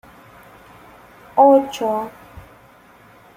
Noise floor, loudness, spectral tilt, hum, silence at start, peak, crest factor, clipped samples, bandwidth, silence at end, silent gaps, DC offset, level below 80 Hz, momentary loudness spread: -48 dBFS; -16 LUFS; -5.5 dB/octave; none; 1.35 s; -2 dBFS; 20 dB; under 0.1%; 15.5 kHz; 0.95 s; none; under 0.1%; -56 dBFS; 13 LU